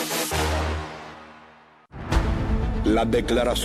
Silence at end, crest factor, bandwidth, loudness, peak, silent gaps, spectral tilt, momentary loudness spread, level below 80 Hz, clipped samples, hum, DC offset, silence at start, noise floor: 0 s; 16 dB; 14.5 kHz; -24 LUFS; -8 dBFS; none; -5 dB/octave; 18 LU; -30 dBFS; under 0.1%; none; under 0.1%; 0 s; -51 dBFS